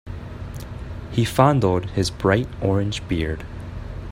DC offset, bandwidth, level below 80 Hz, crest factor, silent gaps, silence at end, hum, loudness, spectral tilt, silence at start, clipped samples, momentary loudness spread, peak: under 0.1%; 16 kHz; -38 dBFS; 22 dB; none; 0 s; none; -21 LUFS; -6.5 dB/octave; 0.05 s; under 0.1%; 17 LU; 0 dBFS